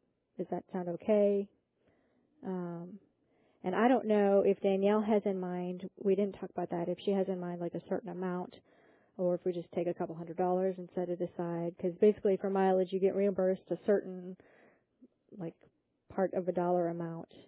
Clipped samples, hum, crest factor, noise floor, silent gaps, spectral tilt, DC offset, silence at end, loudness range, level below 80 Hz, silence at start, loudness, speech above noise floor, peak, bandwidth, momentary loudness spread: under 0.1%; none; 18 dB; -73 dBFS; none; -7 dB/octave; under 0.1%; 0.25 s; 6 LU; -76 dBFS; 0.4 s; -33 LUFS; 40 dB; -14 dBFS; 4 kHz; 15 LU